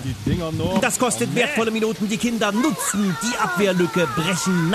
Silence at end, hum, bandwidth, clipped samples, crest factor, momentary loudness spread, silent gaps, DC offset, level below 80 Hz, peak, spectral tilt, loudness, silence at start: 0 s; none; 14 kHz; under 0.1%; 14 dB; 3 LU; none; under 0.1%; -44 dBFS; -6 dBFS; -4.5 dB/octave; -21 LUFS; 0 s